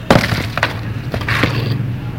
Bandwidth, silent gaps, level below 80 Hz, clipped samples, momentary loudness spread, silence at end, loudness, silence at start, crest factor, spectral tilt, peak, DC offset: 17 kHz; none; -32 dBFS; under 0.1%; 8 LU; 0 s; -17 LUFS; 0 s; 16 dB; -6 dB/octave; 0 dBFS; 0.4%